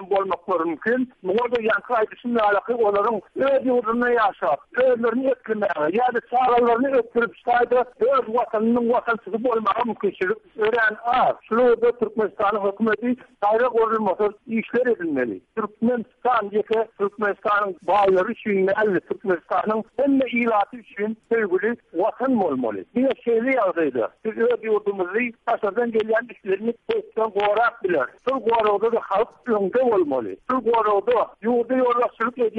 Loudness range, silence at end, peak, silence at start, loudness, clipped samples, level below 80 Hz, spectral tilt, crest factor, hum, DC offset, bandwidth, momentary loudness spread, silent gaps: 2 LU; 0 s; -10 dBFS; 0 s; -22 LUFS; under 0.1%; -60 dBFS; -7.5 dB/octave; 12 dB; none; under 0.1%; 5 kHz; 6 LU; none